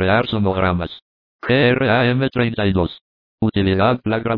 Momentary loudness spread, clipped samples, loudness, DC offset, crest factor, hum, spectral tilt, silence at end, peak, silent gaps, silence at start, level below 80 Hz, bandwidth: 9 LU; under 0.1%; -18 LUFS; under 0.1%; 16 dB; none; -9.5 dB/octave; 0 s; -2 dBFS; 1.02-1.39 s, 3.01-3.38 s; 0 s; -42 dBFS; 5.2 kHz